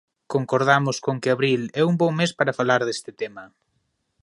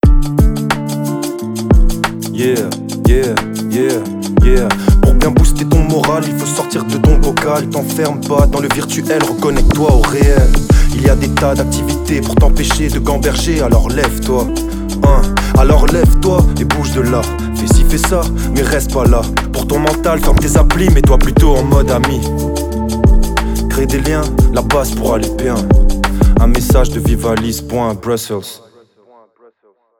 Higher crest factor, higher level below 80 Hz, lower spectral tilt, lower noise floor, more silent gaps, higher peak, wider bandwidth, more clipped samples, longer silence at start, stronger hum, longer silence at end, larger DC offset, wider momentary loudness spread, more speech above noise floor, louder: first, 20 dB vs 10 dB; second, -68 dBFS vs -14 dBFS; about the same, -5.5 dB/octave vs -5.5 dB/octave; first, -72 dBFS vs -55 dBFS; neither; about the same, -2 dBFS vs 0 dBFS; second, 11.5 kHz vs 18 kHz; neither; first, 0.3 s vs 0.05 s; neither; second, 0.75 s vs 1.45 s; neither; first, 11 LU vs 7 LU; first, 50 dB vs 44 dB; second, -22 LUFS vs -13 LUFS